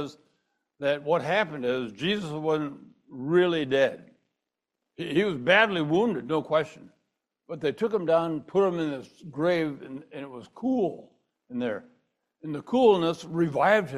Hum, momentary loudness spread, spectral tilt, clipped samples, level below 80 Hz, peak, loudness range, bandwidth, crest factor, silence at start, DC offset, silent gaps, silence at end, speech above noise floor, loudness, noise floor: none; 18 LU; -6.5 dB/octave; under 0.1%; -68 dBFS; -6 dBFS; 5 LU; 12 kHz; 22 dB; 0 s; under 0.1%; none; 0 s; 59 dB; -26 LUFS; -85 dBFS